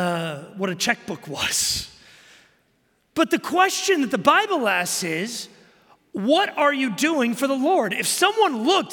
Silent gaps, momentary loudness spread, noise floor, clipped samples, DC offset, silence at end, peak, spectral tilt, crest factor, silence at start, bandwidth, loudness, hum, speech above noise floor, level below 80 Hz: none; 11 LU; -66 dBFS; under 0.1%; under 0.1%; 0 s; -4 dBFS; -3 dB/octave; 20 dB; 0 s; 17 kHz; -21 LUFS; none; 44 dB; -60 dBFS